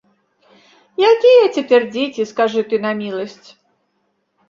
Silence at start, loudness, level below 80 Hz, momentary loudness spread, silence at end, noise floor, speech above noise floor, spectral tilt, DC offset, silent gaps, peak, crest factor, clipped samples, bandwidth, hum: 1 s; -15 LUFS; -66 dBFS; 16 LU; 1.15 s; -67 dBFS; 52 dB; -5 dB/octave; under 0.1%; none; -2 dBFS; 16 dB; under 0.1%; 7.4 kHz; none